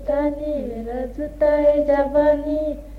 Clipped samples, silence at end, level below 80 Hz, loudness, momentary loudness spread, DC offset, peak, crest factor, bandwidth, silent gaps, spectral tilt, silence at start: under 0.1%; 0 s; -36 dBFS; -20 LUFS; 11 LU; under 0.1%; -6 dBFS; 14 dB; 4.8 kHz; none; -8 dB/octave; 0 s